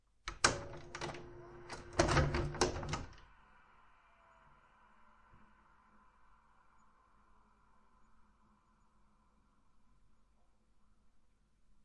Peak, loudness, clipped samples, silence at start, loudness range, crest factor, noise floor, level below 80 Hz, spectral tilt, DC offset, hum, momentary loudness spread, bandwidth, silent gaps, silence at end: -10 dBFS; -37 LUFS; under 0.1%; 0.25 s; 14 LU; 34 dB; -71 dBFS; -54 dBFS; -4 dB/octave; under 0.1%; none; 19 LU; 10.5 kHz; none; 0.65 s